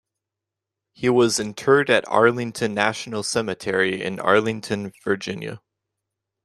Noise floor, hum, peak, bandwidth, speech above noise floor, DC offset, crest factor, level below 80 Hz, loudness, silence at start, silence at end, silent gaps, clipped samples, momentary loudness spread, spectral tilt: -86 dBFS; none; -2 dBFS; 13.5 kHz; 64 dB; under 0.1%; 20 dB; -62 dBFS; -21 LUFS; 1 s; 0.85 s; none; under 0.1%; 10 LU; -4 dB/octave